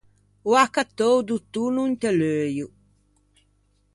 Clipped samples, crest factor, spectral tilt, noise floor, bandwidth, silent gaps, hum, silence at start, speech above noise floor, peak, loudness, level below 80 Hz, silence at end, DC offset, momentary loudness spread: under 0.1%; 20 dB; -5 dB/octave; -65 dBFS; 11.5 kHz; none; 50 Hz at -50 dBFS; 0.45 s; 43 dB; -4 dBFS; -23 LUFS; -62 dBFS; 1.3 s; under 0.1%; 11 LU